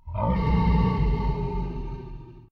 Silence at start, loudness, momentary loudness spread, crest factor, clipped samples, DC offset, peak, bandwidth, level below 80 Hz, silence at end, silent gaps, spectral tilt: 0.05 s; -25 LUFS; 17 LU; 14 dB; under 0.1%; under 0.1%; -10 dBFS; 5.6 kHz; -28 dBFS; 0.1 s; none; -10 dB/octave